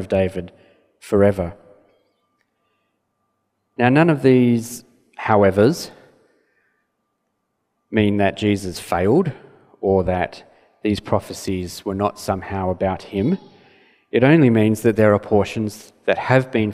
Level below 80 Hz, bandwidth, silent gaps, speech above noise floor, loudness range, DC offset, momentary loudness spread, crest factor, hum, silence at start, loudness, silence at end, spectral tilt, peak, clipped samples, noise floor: -50 dBFS; 15.5 kHz; none; 55 dB; 6 LU; under 0.1%; 12 LU; 20 dB; none; 0 s; -19 LUFS; 0 s; -7 dB/octave; 0 dBFS; under 0.1%; -73 dBFS